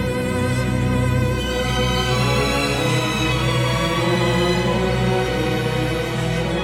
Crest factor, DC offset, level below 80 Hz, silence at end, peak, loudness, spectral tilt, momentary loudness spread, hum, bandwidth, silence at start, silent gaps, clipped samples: 12 dB; under 0.1%; -32 dBFS; 0 s; -6 dBFS; -20 LUFS; -5.5 dB/octave; 3 LU; none; 16.5 kHz; 0 s; none; under 0.1%